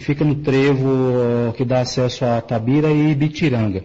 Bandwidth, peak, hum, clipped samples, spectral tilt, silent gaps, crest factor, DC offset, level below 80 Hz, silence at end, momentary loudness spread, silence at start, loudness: 8 kHz; -8 dBFS; none; under 0.1%; -7.5 dB/octave; none; 10 dB; under 0.1%; -46 dBFS; 0 s; 4 LU; 0 s; -18 LUFS